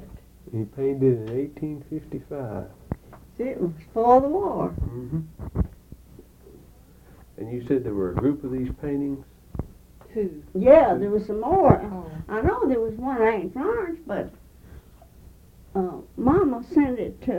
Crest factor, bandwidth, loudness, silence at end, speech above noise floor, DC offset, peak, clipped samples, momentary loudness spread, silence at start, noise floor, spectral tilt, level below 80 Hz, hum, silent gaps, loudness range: 24 dB; 17 kHz; -24 LUFS; 0 s; 27 dB; under 0.1%; 0 dBFS; under 0.1%; 17 LU; 0 s; -50 dBFS; -9.5 dB/octave; -42 dBFS; none; none; 9 LU